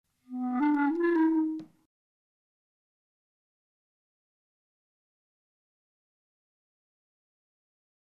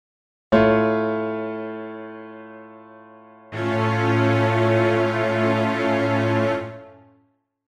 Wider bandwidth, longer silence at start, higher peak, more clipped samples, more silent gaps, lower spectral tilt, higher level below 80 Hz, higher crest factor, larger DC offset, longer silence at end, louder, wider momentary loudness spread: second, 4.5 kHz vs 9.8 kHz; second, 0.3 s vs 0.5 s; second, -18 dBFS vs -4 dBFS; neither; neither; about the same, -7 dB/octave vs -7.5 dB/octave; second, -82 dBFS vs -54 dBFS; about the same, 16 dB vs 18 dB; neither; first, 6.4 s vs 0.75 s; second, -28 LUFS vs -21 LUFS; second, 13 LU vs 19 LU